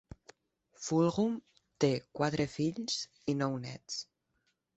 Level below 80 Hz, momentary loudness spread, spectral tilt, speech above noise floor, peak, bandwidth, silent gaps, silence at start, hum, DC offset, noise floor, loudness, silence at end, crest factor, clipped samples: -66 dBFS; 11 LU; -5.5 dB/octave; 46 dB; -14 dBFS; 8.2 kHz; none; 0.8 s; none; under 0.1%; -79 dBFS; -34 LUFS; 0.75 s; 20 dB; under 0.1%